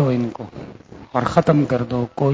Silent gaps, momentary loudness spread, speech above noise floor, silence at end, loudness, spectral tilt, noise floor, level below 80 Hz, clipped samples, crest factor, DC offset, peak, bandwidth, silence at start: none; 19 LU; 21 dB; 0 s; -20 LUFS; -8.5 dB/octave; -40 dBFS; -46 dBFS; under 0.1%; 20 dB; under 0.1%; 0 dBFS; 8 kHz; 0 s